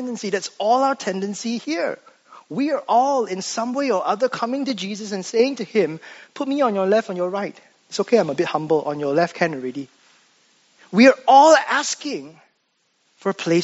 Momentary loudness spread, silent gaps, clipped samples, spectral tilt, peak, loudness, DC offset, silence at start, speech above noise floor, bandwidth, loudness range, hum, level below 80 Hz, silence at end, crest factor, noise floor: 15 LU; none; under 0.1%; -3.5 dB/octave; 0 dBFS; -20 LUFS; under 0.1%; 0 s; 48 dB; 8 kHz; 5 LU; none; -74 dBFS; 0 s; 20 dB; -68 dBFS